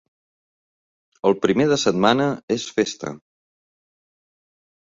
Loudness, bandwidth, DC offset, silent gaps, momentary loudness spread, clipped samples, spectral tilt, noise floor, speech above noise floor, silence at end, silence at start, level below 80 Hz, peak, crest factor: -20 LUFS; 7.8 kHz; under 0.1%; 2.43-2.48 s; 8 LU; under 0.1%; -4.5 dB/octave; under -90 dBFS; over 70 dB; 1.7 s; 1.25 s; -60 dBFS; -2 dBFS; 22 dB